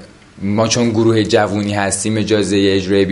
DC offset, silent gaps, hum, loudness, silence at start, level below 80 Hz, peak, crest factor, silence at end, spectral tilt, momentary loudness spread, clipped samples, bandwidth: under 0.1%; none; none; -15 LUFS; 0 s; -42 dBFS; 0 dBFS; 14 dB; 0 s; -5 dB/octave; 4 LU; under 0.1%; 11.5 kHz